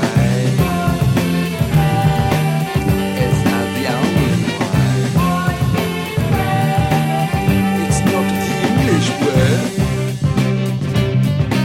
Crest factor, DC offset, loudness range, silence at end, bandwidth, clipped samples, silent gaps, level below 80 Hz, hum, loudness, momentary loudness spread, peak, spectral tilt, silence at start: 14 dB; under 0.1%; 1 LU; 0 s; 16.5 kHz; under 0.1%; none; -32 dBFS; none; -16 LUFS; 3 LU; -2 dBFS; -6 dB/octave; 0 s